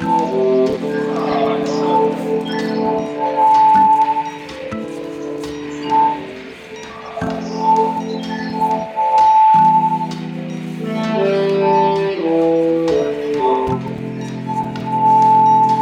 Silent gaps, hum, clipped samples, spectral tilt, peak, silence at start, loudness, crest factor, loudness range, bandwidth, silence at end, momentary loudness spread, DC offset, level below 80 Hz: none; none; under 0.1%; -6.5 dB/octave; -6 dBFS; 0 s; -16 LUFS; 10 dB; 5 LU; 9.8 kHz; 0 s; 15 LU; under 0.1%; -52 dBFS